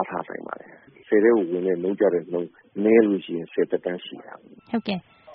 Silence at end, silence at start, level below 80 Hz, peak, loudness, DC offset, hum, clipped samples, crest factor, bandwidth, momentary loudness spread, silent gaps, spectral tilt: 0 s; 0 s; -70 dBFS; -4 dBFS; -23 LUFS; under 0.1%; none; under 0.1%; 20 dB; 4.3 kHz; 16 LU; none; -5.5 dB/octave